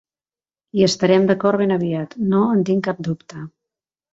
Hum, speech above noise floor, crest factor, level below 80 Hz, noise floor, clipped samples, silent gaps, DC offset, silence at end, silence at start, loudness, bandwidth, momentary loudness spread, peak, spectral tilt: none; over 72 dB; 16 dB; -60 dBFS; under -90 dBFS; under 0.1%; none; under 0.1%; 0.65 s; 0.75 s; -18 LUFS; 7.8 kHz; 14 LU; -2 dBFS; -6 dB/octave